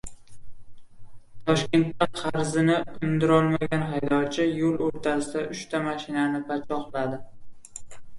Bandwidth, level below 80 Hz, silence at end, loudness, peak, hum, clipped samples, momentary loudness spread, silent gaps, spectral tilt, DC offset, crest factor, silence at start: 11.5 kHz; -54 dBFS; 0 s; -26 LUFS; -8 dBFS; none; under 0.1%; 11 LU; none; -6 dB/octave; under 0.1%; 18 dB; 0.05 s